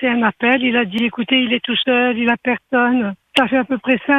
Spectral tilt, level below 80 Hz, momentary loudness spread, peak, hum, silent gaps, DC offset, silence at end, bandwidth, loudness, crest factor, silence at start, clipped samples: -5.5 dB/octave; -58 dBFS; 4 LU; 0 dBFS; none; none; under 0.1%; 0 s; 9.8 kHz; -16 LUFS; 16 dB; 0 s; under 0.1%